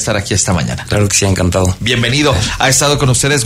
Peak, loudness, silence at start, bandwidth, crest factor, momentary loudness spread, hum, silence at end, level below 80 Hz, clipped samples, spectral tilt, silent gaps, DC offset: 0 dBFS; -12 LUFS; 0 s; 16 kHz; 12 dB; 4 LU; none; 0 s; -30 dBFS; under 0.1%; -3.5 dB/octave; none; under 0.1%